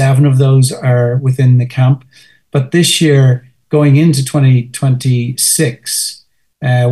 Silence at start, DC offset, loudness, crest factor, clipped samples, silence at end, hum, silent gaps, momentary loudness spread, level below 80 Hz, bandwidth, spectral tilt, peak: 0 s; 0.2%; -11 LUFS; 10 dB; under 0.1%; 0 s; none; none; 8 LU; -54 dBFS; 12.5 kHz; -5.5 dB/octave; 0 dBFS